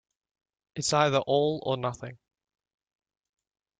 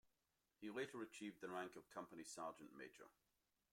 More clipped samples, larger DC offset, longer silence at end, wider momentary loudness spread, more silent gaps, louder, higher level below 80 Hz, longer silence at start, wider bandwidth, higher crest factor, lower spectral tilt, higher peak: neither; neither; first, 1.65 s vs 0.6 s; first, 18 LU vs 10 LU; neither; first, -27 LUFS vs -54 LUFS; first, -66 dBFS vs under -90 dBFS; first, 0.75 s vs 0.05 s; second, 9.6 kHz vs 16.5 kHz; about the same, 22 dB vs 20 dB; about the same, -4.5 dB/octave vs -4 dB/octave; first, -10 dBFS vs -36 dBFS